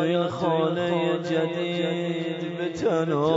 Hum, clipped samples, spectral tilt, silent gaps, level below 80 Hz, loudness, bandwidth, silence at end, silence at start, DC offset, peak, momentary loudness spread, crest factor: none; under 0.1%; -6.5 dB/octave; none; -64 dBFS; -25 LUFS; 7.8 kHz; 0 s; 0 s; under 0.1%; -10 dBFS; 5 LU; 14 dB